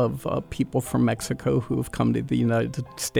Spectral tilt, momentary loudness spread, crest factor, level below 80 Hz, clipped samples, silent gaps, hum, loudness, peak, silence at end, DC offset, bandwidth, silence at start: -6 dB/octave; 6 LU; 14 dB; -48 dBFS; under 0.1%; none; none; -25 LUFS; -10 dBFS; 0 s; under 0.1%; 18.5 kHz; 0 s